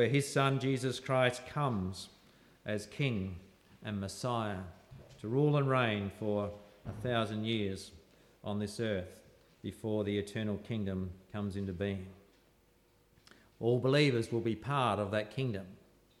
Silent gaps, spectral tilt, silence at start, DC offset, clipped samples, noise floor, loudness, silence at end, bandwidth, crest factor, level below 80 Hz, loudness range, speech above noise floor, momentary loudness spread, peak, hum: none; -6 dB/octave; 0 s; under 0.1%; under 0.1%; -68 dBFS; -34 LUFS; 0.45 s; 14 kHz; 20 dB; -66 dBFS; 6 LU; 34 dB; 17 LU; -16 dBFS; none